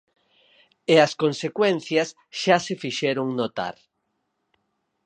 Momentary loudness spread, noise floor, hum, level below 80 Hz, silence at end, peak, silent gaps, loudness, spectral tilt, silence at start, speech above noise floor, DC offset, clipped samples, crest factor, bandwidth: 12 LU; -76 dBFS; none; -72 dBFS; 1.35 s; -2 dBFS; none; -23 LUFS; -4.5 dB/octave; 0.9 s; 53 dB; under 0.1%; under 0.1%; 22 dB; 9.8 kHz